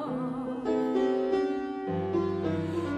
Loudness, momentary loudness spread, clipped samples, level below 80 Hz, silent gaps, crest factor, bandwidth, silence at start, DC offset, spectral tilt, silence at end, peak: -30 LUFS; 6 LU; under 0.1%; -62 dBFS; none; 14 dB; 9.2 kHz; 0 s; under 0.1%; -8 dB/octave; 0 s; -16 dBFS